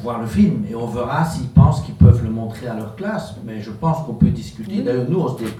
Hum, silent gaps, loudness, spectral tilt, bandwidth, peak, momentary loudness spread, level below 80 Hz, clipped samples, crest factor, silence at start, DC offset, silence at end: none; none; -18 LUFS; -8.5 dB/octave; 13 kHz; 0 dBFS; 14 LU; -32 dBFS; under 0.1%; 18 dB; 0 s; under 0.1%; 0 s